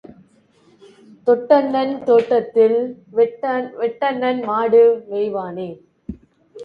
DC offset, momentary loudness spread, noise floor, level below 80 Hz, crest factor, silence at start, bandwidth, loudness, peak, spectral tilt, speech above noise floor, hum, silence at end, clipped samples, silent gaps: under 0.1%; 16 LU; -55 dBFS; -56 dBFS; 18 dB; 1.25 s; 5.2 kHz; -18 LUFS; -2 dBFS; -7.5 dB/octave; 38 dB; none; 0 s; under 0.1%; none